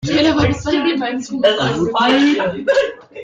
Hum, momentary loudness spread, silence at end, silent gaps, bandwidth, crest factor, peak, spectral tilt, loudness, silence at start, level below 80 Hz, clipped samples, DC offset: none; 6 LU; 0 s; none; 8 kHz; 14 dB; -2 dBFS; -5 dB/octave; -16 LUFS; 0 s; -42 dBFS; under 0.1%; under 0.1%